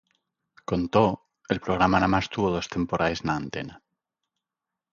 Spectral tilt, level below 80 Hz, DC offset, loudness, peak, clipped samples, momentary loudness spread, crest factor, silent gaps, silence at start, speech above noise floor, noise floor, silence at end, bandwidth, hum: -6 dB/octave; -48 dBFS; under 0.1%; -25 LUFS; -6 dBFS; under 0.1%; 14 LU; 22 dB; none; 0.7 s; 63 dB; -88 dBFS; 1.15 s; 7.4 kHz; none